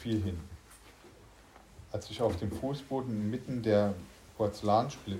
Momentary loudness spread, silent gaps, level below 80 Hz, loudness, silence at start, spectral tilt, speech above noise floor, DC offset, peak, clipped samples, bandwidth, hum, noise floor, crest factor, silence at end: 17 LU; none; -56 dBFS; -33 LUFS; 0 s; -7 dB/octave; 24 dB; under 0.1%; -14 dBFS; under 0.1%; 16 kHz; none; -57 dBFS; 20 dB; 0 s